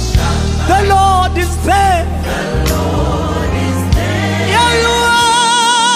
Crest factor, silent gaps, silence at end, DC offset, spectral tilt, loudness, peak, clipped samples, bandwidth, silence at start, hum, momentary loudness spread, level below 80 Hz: 12 dB; none; 0 s; under 0.1%; -4 dB/octave; -12 LUFS; 0 dBFS; under 0.1%; 15.5 kHz; 0 s; none; 6 LU; -20 dBFS